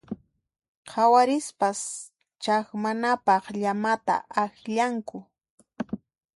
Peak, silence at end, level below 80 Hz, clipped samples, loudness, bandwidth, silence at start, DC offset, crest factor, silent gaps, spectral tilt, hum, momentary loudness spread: -8 dBFS; 0.4 s; -70 dBFS; under 0.1%; -25 LUFS; 11.5 kHz; 0.1 s; under 0.1%; 18 dB; 0.68-0.83 s, 5.50-5.58 s; -4 dB/octave; none; 19 LU